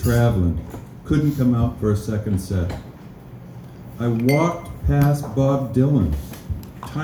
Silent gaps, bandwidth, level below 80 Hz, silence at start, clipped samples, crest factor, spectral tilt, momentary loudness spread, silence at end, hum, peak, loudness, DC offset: none; over 20 kHz; -34 dBFS; 0 s; under 0.1%; 16 dB; -8 dB/octave; 21 LU; 0 s; none; -4 dBFS; -21 LUFS; under 0.1%